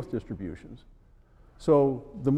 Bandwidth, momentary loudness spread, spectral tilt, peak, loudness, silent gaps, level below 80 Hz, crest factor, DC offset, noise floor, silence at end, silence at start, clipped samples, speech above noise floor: 9.8 kHz; 21 LU; -9.5 dB/octave; -10 dBFS; -27 LUFS; none; -52 dBFS; 20 dB; under 0.1%; -56 dBFS; 0 s; 0 s; under 0.1%; 29 dB